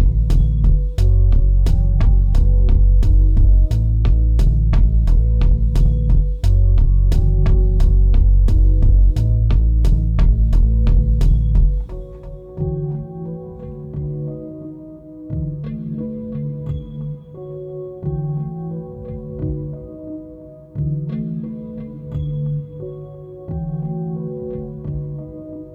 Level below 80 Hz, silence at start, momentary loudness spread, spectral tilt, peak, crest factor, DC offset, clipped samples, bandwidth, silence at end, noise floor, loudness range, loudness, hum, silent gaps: -16 dBFS; 0 s; 17 LU; -9.5 dB/octave; -4 dBFS; 10 dB; under 0.1%; under 0.1%; 5.2 kHz; 0 s; -38 dBFS; 12 LU; -19 LUFS; none; none